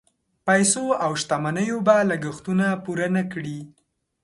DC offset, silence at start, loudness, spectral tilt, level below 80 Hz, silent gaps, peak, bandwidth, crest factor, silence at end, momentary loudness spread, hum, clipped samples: under 0.1%; 0.45 s; -22 LUFS; -4.5 dB/octave; -62 dBFS; none; -4 dBFS; 11.5 kHz; 20 dB; 0.55 s; 12 LU; none; under 0.1%